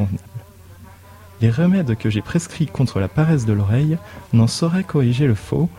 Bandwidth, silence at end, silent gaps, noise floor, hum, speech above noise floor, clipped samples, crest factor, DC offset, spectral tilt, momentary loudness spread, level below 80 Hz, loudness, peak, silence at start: 13 kHz; 0 s; none; -42 dBFS; none; 25 dB; under 0.1%; 16 dB; under 0.1%; -7 dB/octave; 7 LU; -46 dBFS; -19 LUFS; -4 dBFS; 0 s